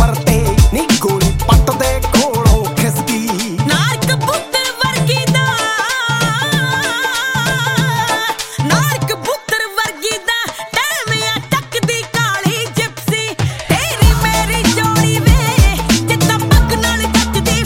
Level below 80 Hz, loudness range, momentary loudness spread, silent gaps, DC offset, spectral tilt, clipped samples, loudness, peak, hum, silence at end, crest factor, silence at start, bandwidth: -22 dBFS; 4 LU; 5 LU; none; under 0.1%; -4 dB/octave; under 0.1%; -14 LUFS; 0 dBFS; none; 0 s; 14 dB; 0 s; 17 kHz